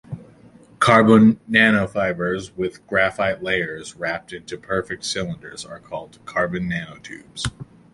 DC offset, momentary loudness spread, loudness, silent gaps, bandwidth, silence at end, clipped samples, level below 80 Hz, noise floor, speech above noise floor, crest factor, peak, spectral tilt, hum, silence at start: under 0.1%; 20 LU; -20 LUFS; none; 11.5 kHz; 0.3 s; under 0.1%; -50 dBFS; -49 dBFS; 28 dB; 20 dB; -2 dBFS; -5.5 dB/octave; none; 0.1 s